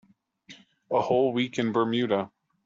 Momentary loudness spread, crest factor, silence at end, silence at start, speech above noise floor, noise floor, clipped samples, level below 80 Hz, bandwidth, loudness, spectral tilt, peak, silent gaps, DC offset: 5 LU; 18 dB; 0.4 s; 0.5 s; 29 dB; -54 dBFS; under 0.1%; -70 dBFS; 7.6 kHz; -26 LUFS; -6 dB/octave; -10 dBFS; none; under 0.1%